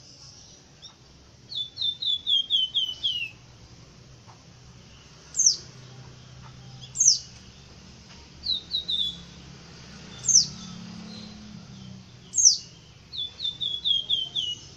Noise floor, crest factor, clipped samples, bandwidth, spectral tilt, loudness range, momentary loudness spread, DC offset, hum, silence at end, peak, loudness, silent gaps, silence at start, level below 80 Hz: -52 dBFS; 28 dB; under 0.1%; 15.5 kHz; 0.5 dB/octave; 5 LU; 27 LU; under 0.1%; none; 0 s; -2 dBFS; -23 LUFS; none; 0.1 s; -58 dBFS